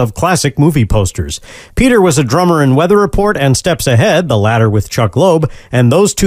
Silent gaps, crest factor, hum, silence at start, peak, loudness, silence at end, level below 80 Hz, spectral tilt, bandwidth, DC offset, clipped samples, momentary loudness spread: none; 10 dB; none; 0 s; 0 dBFS; -11 LUFS; 0 s; -28 dBFS; -5.5 dB/octave; 16 kHz; under 0.1%; under 0.1%; 6 LU